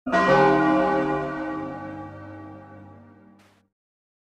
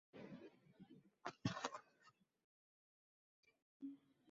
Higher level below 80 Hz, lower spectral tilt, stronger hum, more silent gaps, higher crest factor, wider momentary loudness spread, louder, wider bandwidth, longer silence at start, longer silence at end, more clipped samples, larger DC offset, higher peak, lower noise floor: first, -54 dBFS vs -82 dBFS; first, -7 dB/octave vs -4.5 dB/octave; neither; second, none vs 2.44-3.43 s, 3.62-3.80 s; second, 18 dB vs 28 dB; first, 23 LU vs 19 LU; first, -21 LUFS vs -52 LUFS; first, 9.2 kHz vs 7.4 kHz; about the same, 0.05 s vs 0.15 s; first, 1.3 s vs 0 s; neither; neither; first, -6 dBFS vs -26 dBFS; second, -55 dBFS vs -75 dBFS